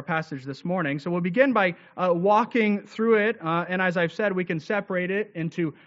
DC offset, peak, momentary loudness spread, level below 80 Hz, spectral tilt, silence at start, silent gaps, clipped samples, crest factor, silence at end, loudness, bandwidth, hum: under 0.1%; -6 dBFS; 8 LU; -72 dBFS; -5 dB/octave; 0 s; none; under 0.1%; 18 dB; 0.15 s; -24 LUFS; 7.6 kHz; none